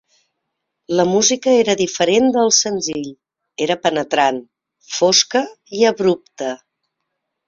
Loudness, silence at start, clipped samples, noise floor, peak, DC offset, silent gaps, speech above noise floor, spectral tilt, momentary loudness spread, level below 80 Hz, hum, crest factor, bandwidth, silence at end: -16 LUFS; 0.9 s; under 0.1%; -76 dBFS; -2 dBFS; under 0.1%; none; 60 dB; -2.5 dB/octave; 14 LU; -62 dBFS; none; 18 dB; 7.8 kHz; 0.9 s